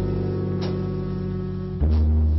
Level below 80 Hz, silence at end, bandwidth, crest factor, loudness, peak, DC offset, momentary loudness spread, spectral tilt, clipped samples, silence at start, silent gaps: -26 dBFS; 0 s; 5.8 kHz; 8 dB; -25 LUFS; -16 dBFS; 0.1%; 8 LU; -9.5 dB/octave; under 0.1%; 0 s; none